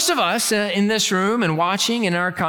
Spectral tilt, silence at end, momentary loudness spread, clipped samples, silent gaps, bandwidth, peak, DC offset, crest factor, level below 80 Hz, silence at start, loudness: -3.5 dB/octave; 0 s; 2 LU; under 0.1%; none; 19 kHz; -6 dBFS; under 0.1%; 14 dB; -60 dBFS; 0 s; -19 LUFS